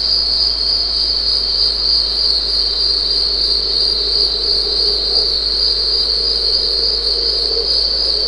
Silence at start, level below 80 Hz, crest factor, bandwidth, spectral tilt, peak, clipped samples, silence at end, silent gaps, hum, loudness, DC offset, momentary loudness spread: 0 s; -32 dBFS; 14 dB; 11 kHz; -2.5 dB/octave; -2 dBFS; under 0.1%; 0 s; none; none; -12 LUFS; 0.4%; 1 LU